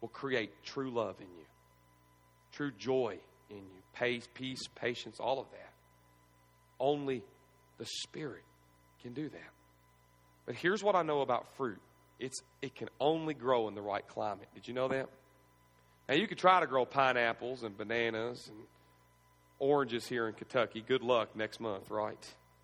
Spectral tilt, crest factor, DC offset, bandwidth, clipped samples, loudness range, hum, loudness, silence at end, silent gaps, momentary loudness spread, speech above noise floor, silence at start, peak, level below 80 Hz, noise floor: -4.5 dB/octave; 26 dB; under 0.1%; 14.5 kHz; under 0.1%; 9 LU; 60 Hz at -70 dBFS; -35 LUFS; 0.3 s; none; 21 LU; 31 dB; 0 s; -12 dBFS; -74 dBFS; -67 dBFS